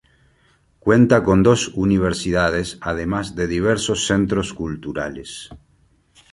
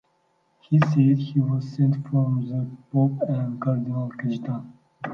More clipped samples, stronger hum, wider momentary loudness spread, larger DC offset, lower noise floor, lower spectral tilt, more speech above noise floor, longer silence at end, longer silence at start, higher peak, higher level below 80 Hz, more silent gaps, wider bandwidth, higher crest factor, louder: neither; neither; first, 14 LU vs 10 LU; neither; second, -59 dBFS vs -67 dBFS; second, -5.5 dB/octave vs -10 dB/octave; second, 40 dB vs 45 dB; first, 0.75 s vs 0 s; first, 0.85 s vs 0.7 s; first, -2 dBFS vs -6 dBFS; first, -40 dBFS vs -66 dBFS; neither; first, 11.5 kHz vs 6.2 kHz; about the same, 18 dB vs 18 dB; first, -19 LUFS vs -24 LUFS